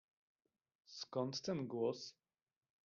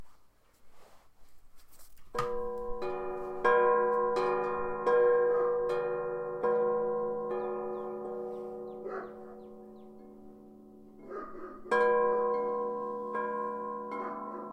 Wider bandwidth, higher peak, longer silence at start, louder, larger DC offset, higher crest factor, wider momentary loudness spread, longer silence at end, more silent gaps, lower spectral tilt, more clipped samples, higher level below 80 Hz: second, 7.2 kHz vs 8.8 kHz; second, -28 dBFS vs -12 dBFS; first, 0.9 s vs 0 s; second, -43 LUFS vs -32 LUFS; neither; about the same, 18 dB vs 20 dB; second, 12 LU vs 20 LU; first, 0.75 s vs 0 s; neither; about the same, -5.5 dB/octave vs -6 dB/octave; neither; second, -86 dBFS vs -58 dBFS